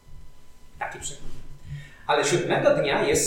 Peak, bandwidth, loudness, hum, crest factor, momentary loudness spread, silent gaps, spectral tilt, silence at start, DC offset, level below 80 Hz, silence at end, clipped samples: -8 dBFS; 18 kHz; -24 LUFS; none; 18 dB; 20 LU; none; -3.5 dB/octave; 0.1 s; under 0.1%; -44 dBFS; 0 s; under 0.1%